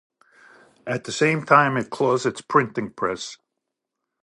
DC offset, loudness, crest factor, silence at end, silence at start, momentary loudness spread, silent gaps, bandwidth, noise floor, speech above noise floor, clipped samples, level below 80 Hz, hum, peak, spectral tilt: under 0.1%; -22 LUFS; 22 dB; 0.9 s; 0.85 s; 14 LU; none; 11.5 kHz; -82 dBFS; 60 dB; under 0.1%; -66 dBFS; none; -2 dBFS; -5 dB/octave